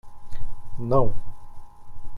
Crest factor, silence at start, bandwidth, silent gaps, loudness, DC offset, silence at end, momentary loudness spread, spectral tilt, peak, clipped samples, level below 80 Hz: 14 dB; 0.05 s; 2 kHz; none; -25 LUFS; under 0.1%; 0 s; 24 LU; -10 dB/octave; -6 dBFS; under 0.1%; -34 dBFS